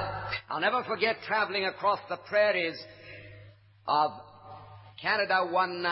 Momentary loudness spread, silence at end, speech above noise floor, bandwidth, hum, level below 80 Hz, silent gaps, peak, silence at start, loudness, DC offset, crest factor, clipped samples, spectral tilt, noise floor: 22 LU; 0 s; 25 dB; 5.8 kHz; none; -64 dBFS; none; -14 dBFS; 0 s; -28 LUFS; under 0.1%; 18 dB; under 0.1%; -7.5 dB/octave; -54 dBFS